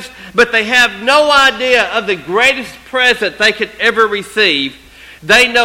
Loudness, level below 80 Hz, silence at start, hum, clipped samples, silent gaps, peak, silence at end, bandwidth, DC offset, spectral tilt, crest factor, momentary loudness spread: -11 LUFS; -44 dBFS; 0 s; none; 0.2%; none; 0 dBFS; 0 s; 17 kHz; under 0.1%; -2 dB/octave; 12 dB; 8 LU